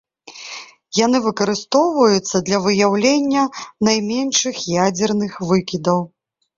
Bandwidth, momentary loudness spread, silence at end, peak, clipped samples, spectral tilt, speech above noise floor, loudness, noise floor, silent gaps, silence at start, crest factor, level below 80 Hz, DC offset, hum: 7.6 kHz; 9 LU; 0.5 s; -2 dBFS; under 0.1%; -4 dB/octave; 20 dB; -17 LUFS; -37 dBFS; none; 0.25 s; 16 dB; -56 dBFS; under 0.1%; none